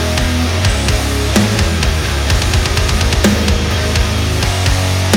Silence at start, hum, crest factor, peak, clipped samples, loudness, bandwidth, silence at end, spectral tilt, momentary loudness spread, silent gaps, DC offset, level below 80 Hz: 0 s; none; 12 dB; 0 dBFS; under 0.1%; -14 LUFS; 18 kHz; 0 s; -4.5 dB/octave; 3 LU; none; under 0.1%; -18 dBFS